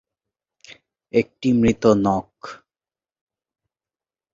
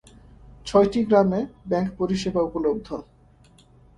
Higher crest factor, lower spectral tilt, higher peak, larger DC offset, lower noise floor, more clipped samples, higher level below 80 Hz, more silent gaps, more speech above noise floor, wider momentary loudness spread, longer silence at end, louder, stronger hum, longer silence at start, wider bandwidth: about the same, 22 dB vs 20 dB; about the same, -7 dB/octave vs -7 dB/octave; about the same, -2 dBFS vs -4 dBFS; neither; first, under -90 dBFS vs -54 dBFS; neither; about the same, -50 dBFS vs -48 dBFS; neither; first, over 71 dB vs 32 dB; first, 21 LU vs 13 LU; first, 1.8 s vs 0.95 s; first, -19 LUFS vs -23 LUFS; neither; first, 1.15 s vs 0.65 s; second, 7.6 kHz vs 11 kHz